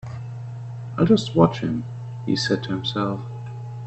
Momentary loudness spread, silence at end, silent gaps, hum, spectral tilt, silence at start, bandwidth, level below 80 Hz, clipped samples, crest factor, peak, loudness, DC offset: 16 LU; 0 s; none; none; -6.5 dB/octave; 0.05 s; 8.4 kHz; -52 dBFS; under 0.1%; 22 dB; 0 dBFS; -22 LUFS; under 0.1%